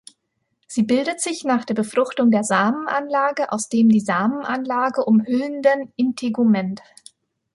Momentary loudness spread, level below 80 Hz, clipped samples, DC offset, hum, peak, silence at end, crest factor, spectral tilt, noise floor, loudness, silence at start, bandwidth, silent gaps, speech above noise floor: 7 LU; -66 dBFS; under 0.1%; under 0.1%; none; -4 dBFS; 0.75 s; 16 dB; -5 dB/octave; -73 dBFS; -20 LUFS; 0.7 s; 11.5 kHz; none; 54 dB